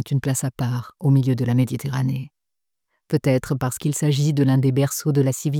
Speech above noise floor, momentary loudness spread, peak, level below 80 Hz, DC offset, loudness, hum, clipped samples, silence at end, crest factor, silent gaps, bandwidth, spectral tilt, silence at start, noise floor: 66 dB; 7 LU; -6 dBFS; -56 dBFS; under 0.1%; -21 LUFS; none; under 0.1%; 0 s; 14 dB; none; 17 kHz; -6.5 dB/octave; 0 s; -86 dBFS